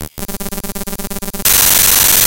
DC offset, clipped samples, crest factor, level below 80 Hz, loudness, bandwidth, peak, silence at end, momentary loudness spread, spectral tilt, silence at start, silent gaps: under 0.1%; under 0.1%; 14 dB; -30 dBFS; -7 LUFS; over 20 kHz; 0 dBFS; 0 s; 17 LU; -0.5 dB/octave; 0 s; none